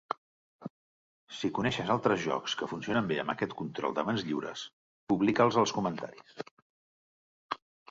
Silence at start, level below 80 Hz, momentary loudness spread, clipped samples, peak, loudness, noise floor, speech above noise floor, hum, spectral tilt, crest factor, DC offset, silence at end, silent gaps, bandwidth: 0.1 s; -66 dBFS; 20 LU; under 0.1%; -10 dBFS; -31 LUFS; under -90 dBFS; over 59 dB; none; -5 dB/octave; 22 dB; under 0.1%; 0.35 s; 0.17-0.59 s, 0.70-1.27 s, 4.73-5.07 s, 6.51-7.49 s; 8 kHz